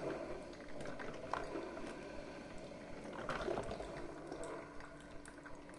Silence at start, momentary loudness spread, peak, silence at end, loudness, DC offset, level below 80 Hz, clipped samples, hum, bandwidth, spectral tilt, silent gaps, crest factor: 0 s; 11 LU; -24 dBFS; 0 s; -47 LUFS; under 0.1%; -60 dBFS; under 0.1%; none; 11.5 kHz; -5 dB/octave; none; 22 dB